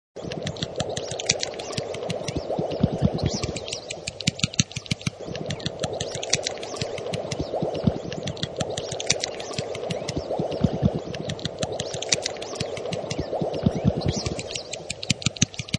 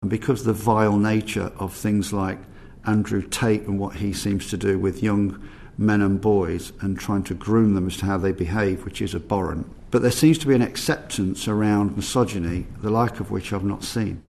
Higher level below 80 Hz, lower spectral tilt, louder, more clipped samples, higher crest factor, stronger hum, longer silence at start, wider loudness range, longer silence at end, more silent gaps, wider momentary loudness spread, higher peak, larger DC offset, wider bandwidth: about the same, -46 dBFS vs -42 dBFS; second, -4 dB/octave vs -6 dB/octave; second, -27 LUFS vs -23 LUFS; neither; first, 28 dB vs 18 dB; neither; first, 0.15 s vs 0 s; about the same, 1 LU vs 3 LU; about the same, 0 s vs 0.1 s; neither; about the same, 7 LU vs 9 LU; first, 0 dBFS vs -4 dBFS; neither; second, 10.5 kHz vs 13.5 kHz